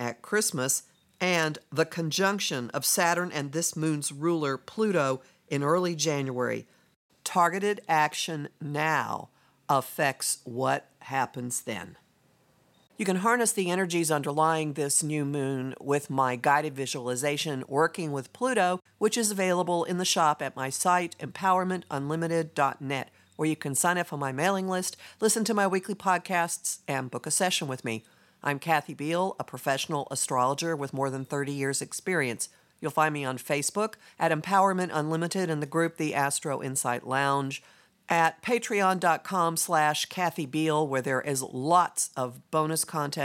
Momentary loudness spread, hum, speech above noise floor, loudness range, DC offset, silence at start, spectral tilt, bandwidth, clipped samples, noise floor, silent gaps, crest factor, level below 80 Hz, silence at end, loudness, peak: 8 LU; none; 37 dB; 3 LU; under 0.1%; 0 s; -3.5 dB/octave; 16.5 kHz; under 0.1%; -65 dBFS; 6.96-7.09 s; 20 dB; -78 dBFS; 0 s; -28 LUFS; -8 dBFS